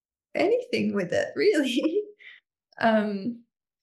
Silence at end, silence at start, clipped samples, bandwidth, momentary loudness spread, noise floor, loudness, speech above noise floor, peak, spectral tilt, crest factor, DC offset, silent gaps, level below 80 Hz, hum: 0.45 s; 0.35 s; under 0.1%; 12.5 kHz; 11 LU; -54 dBFS; -26 LUFS; 30 dB; -10 dBFS; -5.5 dB/octave; 18 dB; under 0.1%; none; -76 dBFS; none